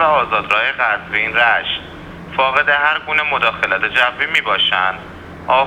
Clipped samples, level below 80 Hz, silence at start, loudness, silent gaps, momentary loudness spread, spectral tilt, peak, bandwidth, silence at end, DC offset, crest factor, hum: under 0.1%; -46 dBFS; 0 s; -15 LUFS; none; 11 LU; -3.5 dB/octave; 0 dBFS; 13.5 kHz; 0 s; under 0.1%; 16 dB; none